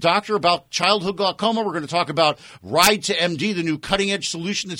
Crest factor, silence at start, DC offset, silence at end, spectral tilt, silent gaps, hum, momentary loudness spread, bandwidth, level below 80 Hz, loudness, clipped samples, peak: 20 dB; 0 s; under 0.1%; 0 s; -3 dB/octave; none; none; 8 LU; over 20 kHz; -52 dBFS; -20 LUFS; under 0.1%; 0 dBFS